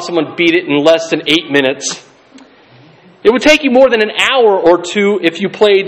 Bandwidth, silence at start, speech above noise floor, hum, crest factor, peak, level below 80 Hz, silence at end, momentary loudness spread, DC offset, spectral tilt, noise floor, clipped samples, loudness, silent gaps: 15 kHz; 0 s; 32 dB; none; 12 dB; 0 dBFS; -48 dBFS; 0 s; 7 LU; under 0.1%; -3.5 dB/octave; -42 dBFS; 0.4%; -11 LUFS; none